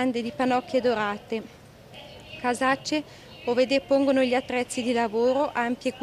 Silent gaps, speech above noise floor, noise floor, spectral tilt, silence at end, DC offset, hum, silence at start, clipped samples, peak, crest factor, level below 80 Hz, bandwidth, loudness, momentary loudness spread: none; 21 dB; -46 dBFS; -4 dB/octave; 0 s; under 0.1%; none; 0 s; under 0.1%; -10 dBFS; 16 dB; -60 dBFS; 13.5 kHz; -25 LUFS; 17 LU